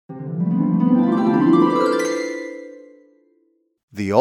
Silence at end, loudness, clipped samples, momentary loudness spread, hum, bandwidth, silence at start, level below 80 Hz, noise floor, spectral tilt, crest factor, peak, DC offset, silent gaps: 0 s; -18 LUFS; under 0.1%; 18 LU; none; 12.5 kHz; 0.1 s; -70 dBFS; -64 dBFS; -7 dB/octave; 18 dB; -2 dBFS; under 0.1%; 3.83-3.88 s